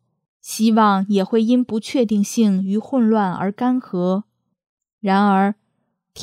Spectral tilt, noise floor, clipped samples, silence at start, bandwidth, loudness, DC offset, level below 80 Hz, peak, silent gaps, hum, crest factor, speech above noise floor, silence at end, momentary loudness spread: -6 dB/octave; -71 dBFS; under 0.1%; 0.45 s; 15 kHz; -18 LUFS; under 0.1%; -70 dBFS; -4 dBFS; 4.69-4.78 s, 4.93-4.98 s; none; 16 dB; 54 dB; 0 s; 7 LU